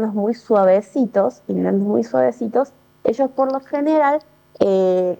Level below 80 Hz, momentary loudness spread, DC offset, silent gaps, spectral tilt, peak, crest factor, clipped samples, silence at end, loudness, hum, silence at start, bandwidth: -66 dBFS; 6 LU; under 0.1%; none; -8 dB/octave; -2 dBFS; 16 dB; under 0.1%; 0.05 s; -19 LUFS; none; 0 s; 19 kHz